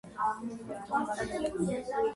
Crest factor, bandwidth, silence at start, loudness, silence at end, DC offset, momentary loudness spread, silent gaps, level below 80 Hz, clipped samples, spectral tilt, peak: 16 dB; 11.5 kHz; 0.05 s; -34 LUFS; 0 s; under 0.1%; 7 LU; none; -58 dBFS; under 0.1%; -5.5 dB/octave; -18 dBFS